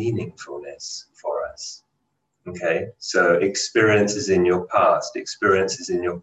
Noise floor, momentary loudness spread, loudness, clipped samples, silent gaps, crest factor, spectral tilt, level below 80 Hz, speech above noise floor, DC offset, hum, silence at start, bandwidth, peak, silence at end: -74 dBFS; 16 LU; -21 LUFS; under 0.1%; none; 18 dB; -4 dB/octave; -54 dBFS; 52 dB; under 0.1%; none; 0 s; 8.8 kHz; -4 dBFS; 0 s